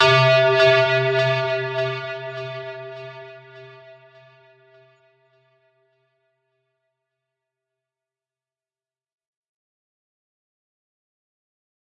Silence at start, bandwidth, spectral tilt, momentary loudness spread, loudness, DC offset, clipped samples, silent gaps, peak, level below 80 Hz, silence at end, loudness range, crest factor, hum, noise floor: 0 s; 9.2 kHz; -5 dB/octave; 22 LU; -18 LUFS; under 0.1%; under 0.1%; none; -4 dBFS; -70 dBFS; 8.3 s; 24 LU; 20 dB; none; under -90 dBFS